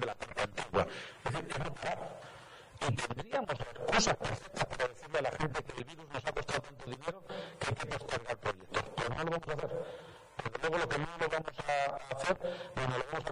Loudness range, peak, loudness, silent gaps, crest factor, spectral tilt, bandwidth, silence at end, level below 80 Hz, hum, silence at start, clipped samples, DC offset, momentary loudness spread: 4 LU; -16 dBFS; -37 LUFS; none; 20 dB; -4 dB/octave; 15.5 kHz; 0 s; -56 dBFS; none; 0 s; under 0.1%; under 0.1%; 10 LU